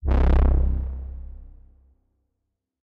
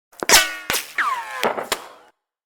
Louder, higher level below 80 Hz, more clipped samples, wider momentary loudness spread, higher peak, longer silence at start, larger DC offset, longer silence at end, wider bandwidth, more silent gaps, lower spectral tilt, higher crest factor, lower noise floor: second, -23 LUFS vs -19 LUFS; first, -24 dBFS vs -48 dBFS; neither; first, 20 LU vs 13 LU; second, -8 dBFS vs -2 dBFS; second, 0.05 s vs 0.2 s; neither; first, 1.35 s vs 0.55 s; second, 4 kHz vs over 20 kHz; neither; first, -10 dB/octave vs 0.5 dB/octave; about the same, 16 dB vs 20 dB; first, -79 dBFS vs -54 dBFS